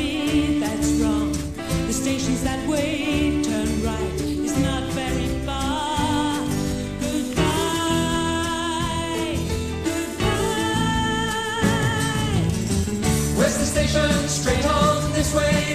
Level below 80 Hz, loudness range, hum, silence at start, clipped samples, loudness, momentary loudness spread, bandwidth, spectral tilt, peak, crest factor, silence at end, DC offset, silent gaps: -34 dBFS; 3 LU; none; 0 s; under 0.1%; -22 LUFS; 5 LU; 13 kHz; -4.5 dB/octave; -6 dBFS; 16 dB; 0 s; 0.4%; none